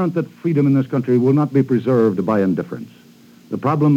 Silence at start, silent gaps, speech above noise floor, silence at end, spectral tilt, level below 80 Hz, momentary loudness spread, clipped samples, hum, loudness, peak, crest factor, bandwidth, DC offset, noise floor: 0 s; none; 30 dB; 0 s; -10 dB/octave; -68 dBFS; 9 LU; under 0.1%; none; -17 LUFS; -4 dBFS; 14 dB; 7.6 kHz; under 0.1%; -46 dBFS